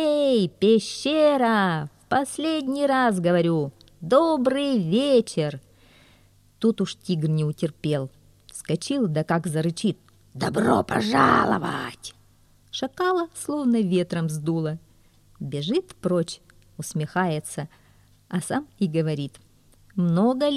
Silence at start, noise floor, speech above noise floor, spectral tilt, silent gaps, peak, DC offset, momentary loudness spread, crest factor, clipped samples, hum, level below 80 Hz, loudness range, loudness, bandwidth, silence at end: 0 s; -57 dBFS; 34 dB; -6 dB/octave; none; -4 dBFS; under 0.1%; 14 LU; 20 dB; under 0.1%; none; -58 dBFS; 7 LU; -24 LUFS; 14 kHz; 0 s